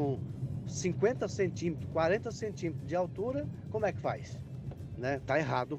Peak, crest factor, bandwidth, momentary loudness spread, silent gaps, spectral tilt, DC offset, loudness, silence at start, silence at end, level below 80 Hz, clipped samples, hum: -16 dBFS; 18 dB; 9 kHz; 9 LU; none; -6.5 dB/octave; under 0.1%; -35 LUFS; 0 s; 0 s; -56 dBFS; under 0.1%; none